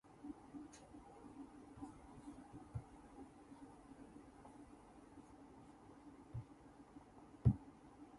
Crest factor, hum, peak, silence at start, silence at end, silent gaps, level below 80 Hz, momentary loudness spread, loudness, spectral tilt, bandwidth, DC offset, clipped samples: 30 dB; none; -20 dBFS; 0.05 s; 0 s; none; -62 dBFS; 14 LU; -49 LUFS; -8.5 dB/octave; 11.5 kHz; under 0.1%; under 0.1%